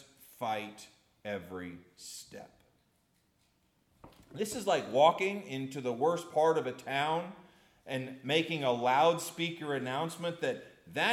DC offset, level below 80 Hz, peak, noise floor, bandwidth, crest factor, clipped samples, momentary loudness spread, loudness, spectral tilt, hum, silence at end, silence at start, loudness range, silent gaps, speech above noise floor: under 0.1%; -76 dBFS; -12 dBFS; -73 dBFS; 16 kHz; 22 dB; under 0.1%; 20 LU; -32 LUFS; -4 dB/octave; none; 0 s; 0.4 s; 15 LU; none; 41 dB